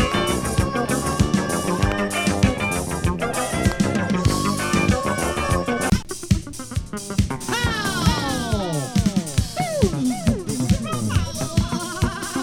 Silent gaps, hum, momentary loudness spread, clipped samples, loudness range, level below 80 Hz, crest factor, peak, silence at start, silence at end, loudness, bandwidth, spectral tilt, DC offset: none; none; 4 LU; under 0.1%; 2 LU; -32 dBFS; 20 dB; -2 dBFS; 0 s; 0 s; -22 LUFS; 18 kHz; -5 dB/octave; under 0.1%